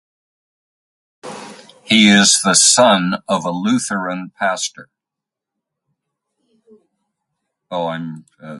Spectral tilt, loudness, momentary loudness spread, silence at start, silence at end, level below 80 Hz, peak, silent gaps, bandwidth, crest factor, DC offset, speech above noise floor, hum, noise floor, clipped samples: -2.5 dB/octave; -14 LUFS; 23 LU; 1.25 s; 0 s; -62 dBFS; 0 dBFS; none; 11.5 kHz; 18 dB; under 0.1%; 69 dB; none; -84 dBFS; under 0.1%